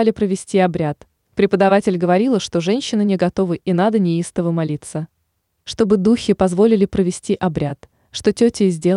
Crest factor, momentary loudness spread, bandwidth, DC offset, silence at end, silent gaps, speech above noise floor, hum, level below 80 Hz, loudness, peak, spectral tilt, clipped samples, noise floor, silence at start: 14 dB; 13 LU; 11 kHz; under 0.1%; 0 s; none; 53 dB; none; -48 dBFS; -17 LUFS; -4 dBFS; -6.5 dB/octave; under 0.1%; -69 dBFS; 0 s